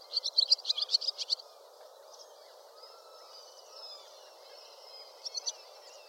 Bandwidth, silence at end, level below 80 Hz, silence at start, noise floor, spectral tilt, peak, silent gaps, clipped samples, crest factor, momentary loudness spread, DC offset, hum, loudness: 16.5 kHz; 0 s; under -90 dBFS; 0 s; -55 dBFS; 6 dB/octave; -12 dBFS; none; under 0.1%; 26 dB; 26 LU; under 0.1%; none; -30 LUFS